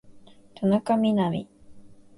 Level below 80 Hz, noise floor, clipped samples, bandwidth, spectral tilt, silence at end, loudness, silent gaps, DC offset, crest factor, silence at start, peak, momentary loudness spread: -60 dBFS; -49 dBFS; under 0.1%; 11.5 kHz; -8 dB/octave; 0.25 s; -25 LUFS; none; under 0.1%; 16 dB; 0.1 s; -10 dBFS; 6 LU